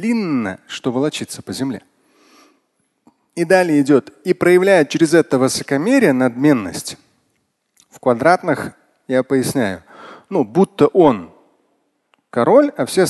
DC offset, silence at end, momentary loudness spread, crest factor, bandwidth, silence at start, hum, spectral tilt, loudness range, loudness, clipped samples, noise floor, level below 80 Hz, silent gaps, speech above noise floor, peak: under 0.1%; 0 s; 13 LU; 16 dB; 12.5 kHz; 0 s; none; -5.5 dB/octave; 6 LU; -16 LUFS; under 0.1%; -67 dBFS; -56 dBFS; none; 52 dB; 0 dBFS